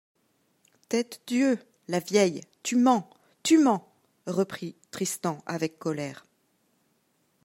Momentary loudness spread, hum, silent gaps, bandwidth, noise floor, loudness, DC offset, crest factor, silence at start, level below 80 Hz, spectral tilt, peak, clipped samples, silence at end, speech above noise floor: 12 LU; none; none; 16 kHz; -71 dBFS; -27 LUFS; under 0.1%; 20 dB; 0.9 s; -78 dBFS; -4.5 dB/octave; -8 dBFS; under 0.1%; 1.3 s; 45 dB